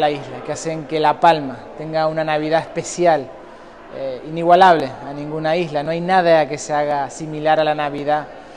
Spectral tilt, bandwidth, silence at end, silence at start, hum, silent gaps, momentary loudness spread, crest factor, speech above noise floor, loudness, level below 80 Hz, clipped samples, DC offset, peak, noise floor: -5 dB/octave; 11 kHz; 0 s; 0 s; none; none; 14 LU; 18 dB; 21 dB; -18 LUFS; -54 dBFS; under 0.1%; under 0.1%; 0 dBFS; -39 dBFS